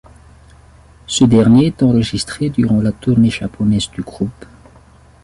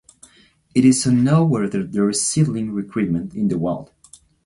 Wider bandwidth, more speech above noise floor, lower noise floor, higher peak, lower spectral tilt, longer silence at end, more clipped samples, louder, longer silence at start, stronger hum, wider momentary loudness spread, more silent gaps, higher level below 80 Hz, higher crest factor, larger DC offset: about the same, 11.5 kHz vs 11.5 kHz; second, 31 dB vs 36 dB; second, -45 dBFS vs -54 dBFS; about the same, -2 dBFS vs -2 dBFS; about the same, -6 dB/octave vs -5.5 dB/octave; first, 0.9 s vs 0.6 s; neither; first, -15 LUFS vs -19 LUFS; first, 1.1 s vs 0.75 s; neither; first, 13 LU vs 9 LU; neither; first, -40 dBFS vs -52 dBFS; about the same, 14 dB vs 16 dB; neither